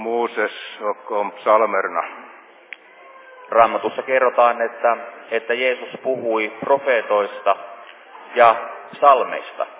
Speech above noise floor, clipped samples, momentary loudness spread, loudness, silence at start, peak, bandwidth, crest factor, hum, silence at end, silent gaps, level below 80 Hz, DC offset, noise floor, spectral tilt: 26 dB; under 0.1%; 14 LU; -19 LUFS; 0 s; 0 dBFS; 4 kHz; 20 dB; none; 0 s; none; -76 dBFS; under 0.1%; -45 dBFS; -7 dB/octave